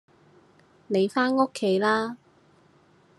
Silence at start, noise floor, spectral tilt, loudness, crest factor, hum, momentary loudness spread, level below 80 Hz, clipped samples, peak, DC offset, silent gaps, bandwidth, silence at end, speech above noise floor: 0.9 s; -59 dBFS; -5.5 dB/octave; -25 LUFS; 20 dB; none; 9 LU; -78 dBFS; under 0.1%; -8 dBFS; under 0.1%; none; 12 kHz; 1.05 s; 36 dB